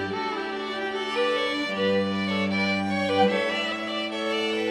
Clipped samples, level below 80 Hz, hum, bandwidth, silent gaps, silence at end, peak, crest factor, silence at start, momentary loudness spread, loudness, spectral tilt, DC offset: under 0.1%; -66 dBFS; none; 12.5 kHz; none; 0 s; -10 dBFS; 16 dB; 0 s; 7 LU; -25 LUFS; -5 dB/octave; under 0.1%